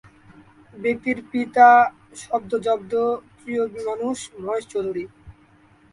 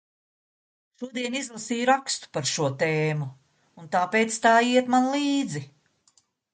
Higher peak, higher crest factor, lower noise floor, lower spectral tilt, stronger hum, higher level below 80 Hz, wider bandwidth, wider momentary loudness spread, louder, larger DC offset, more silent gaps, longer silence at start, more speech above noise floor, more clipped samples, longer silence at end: first, 0 dBFS vs -6 dBFS; about the same, 22 dB vs 20 dB; second, -54 dBFS vs -66 dBFS; about the same, -4.5 dB/octave vs -4 dB/octave; neither; first, -60 dBFS vs -72 dBFS; first, 11.5 kHz vs 9.6 kHz; first, 16 LU vs 13 LU; first, -21 LUFS vs -24 LUFS; neither; neither; second, 0.75 s vs 1 s; second, 34 dB vs 41 dB; neither; second, 0.6 s vs 0.9 s